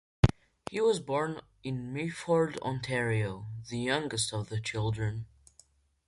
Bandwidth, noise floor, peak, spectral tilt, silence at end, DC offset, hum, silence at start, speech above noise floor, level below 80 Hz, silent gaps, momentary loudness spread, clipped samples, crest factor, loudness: 11.5 kHz; -64 dBFS; -4 dBFS; -5.5 dB/octave; 0.8 s; under 0.1%; none; 0.25 s; 32 dB; -48 dBFS; none; 11 LU; under 0.1%; 28 dB; -32 LUFS